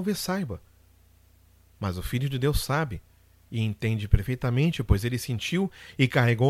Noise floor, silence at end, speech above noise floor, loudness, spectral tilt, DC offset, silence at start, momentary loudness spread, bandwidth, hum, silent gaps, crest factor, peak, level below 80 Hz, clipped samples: -58 dBFS; 0 s; 32 dB; -27 LUFS; -6 dB/octave; under 0.1%; 0 s; 10 LU; 16 kHz; none; none; 22 dB; -4 dBFS; -36 dBFS; under 0.1%